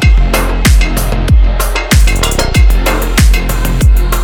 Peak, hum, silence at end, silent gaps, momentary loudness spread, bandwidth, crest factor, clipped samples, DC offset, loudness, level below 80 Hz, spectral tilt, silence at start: 0 dBFS; none; 0 s; none; 4 LU; 19 kHz; 8 dB; under 0.1%; under 0.1%; -11 LUFS; -10 dBFS; -4.5 dB/octave; 0 s